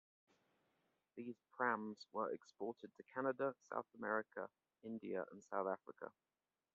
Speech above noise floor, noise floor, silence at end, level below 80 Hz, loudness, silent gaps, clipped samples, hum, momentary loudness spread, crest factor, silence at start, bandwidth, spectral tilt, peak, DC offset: 39 dB; -84 dBFS; 0.65 s; under -90 dBFS; -46 LUFS; none; under 0.1%; none; 14 LU; 24 dB; 1.15 s; 7.2 kHz; -4.5 dB/octave; -24 dBFS; under 0.1%